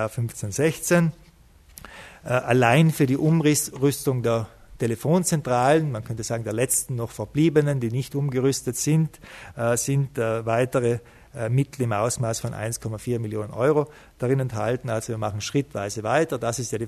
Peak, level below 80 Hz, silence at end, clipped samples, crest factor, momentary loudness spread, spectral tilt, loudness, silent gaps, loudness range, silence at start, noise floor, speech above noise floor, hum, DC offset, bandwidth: -2 dBFS; -54 dBFS; 0 s; under 0.1%; 20 dB; 10 LU; -5.5 dB/octave; -24 LUFS; none; 4 LU; 0 s; -52 dBFS; 29 dB; none; under 0.1%; 14 kHz